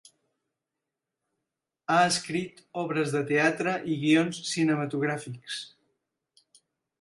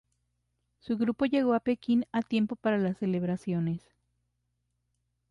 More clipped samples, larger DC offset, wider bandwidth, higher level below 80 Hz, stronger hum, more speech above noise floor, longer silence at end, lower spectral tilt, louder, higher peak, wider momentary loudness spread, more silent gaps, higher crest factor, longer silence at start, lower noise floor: neither; neither; about the same, 11.5 kHz vs 10.5 kHz; second, -74 dBFS vs -66 dBFS; second, none vs 60 Hz at -50 dBFS; first, 60 dB vs 50 dB; second, 1.35 s vs 1.5 s; second, -4.5 dB/octave vs -8.5 dB/octave; about the same, -27 LUFS vs -29 LUFS; first, -10 dBFS vs -16 dBFS; first, 13 LU vs 5 LU; neither; about the same, 20 dB vs 16 dB; first, 1.9 s vs 0.85 s; first, -87 dBFS vs -79 dBFS